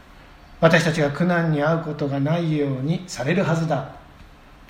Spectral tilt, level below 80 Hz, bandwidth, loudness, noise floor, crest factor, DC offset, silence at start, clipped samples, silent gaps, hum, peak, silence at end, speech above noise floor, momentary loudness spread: -6.5 dB/octave; -50 dBFS; 10.5 kHz; -21 LUFS; -46 dBFS; 20 dB; under 0.1%; 0.5 s; under 0.1%; none; none; -2 dBFS; 0.05 s; 25 dB; 8 LU